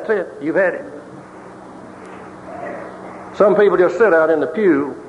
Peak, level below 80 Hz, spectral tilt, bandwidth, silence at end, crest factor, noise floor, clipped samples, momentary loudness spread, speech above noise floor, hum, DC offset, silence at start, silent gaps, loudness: -2 dBFS; -58 dBFS; -7 dB/octave; 10.5 kHz; 0 s; 16 dB; -37 dBFS; under 0.1%; 24 LU; 22 dB; none; under 0.1%; 0 s; none; -15 LUFS